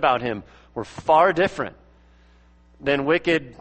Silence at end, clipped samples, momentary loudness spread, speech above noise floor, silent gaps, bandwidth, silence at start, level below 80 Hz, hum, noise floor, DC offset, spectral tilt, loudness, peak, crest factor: 0.1 s; under 0.1%; 17 LU; 32 dB; none; 8.4 kHz; 0 s; -52 dBFS; none; -53 dBFS; under 0.1%; -6 dB/octave; -21 LUFS; -4 dBFS; 18 dB